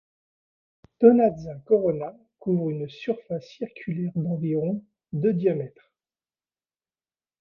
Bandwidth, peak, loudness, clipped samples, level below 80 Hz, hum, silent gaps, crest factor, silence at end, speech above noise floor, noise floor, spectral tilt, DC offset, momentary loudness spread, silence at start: 6.4 kHz; -2 dBFS; -25 LUFS; under 0.1%; -64 dBFS; none; none; 24 dB; 1.75 s; over 66 dB; under -90 dBFS; -10 dB/octave; under 0.1%; 16 LU; 1 s